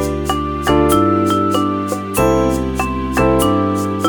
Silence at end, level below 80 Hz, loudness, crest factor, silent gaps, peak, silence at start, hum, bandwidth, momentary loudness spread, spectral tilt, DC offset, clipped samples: 0 s; -28 dBFS; -16 LUFS; 14 dB; none; 0 dBFS; 0 s; none; over 20 kHz; 6 LU; -5.5 dB/octave; under 0.1%; under 0.1%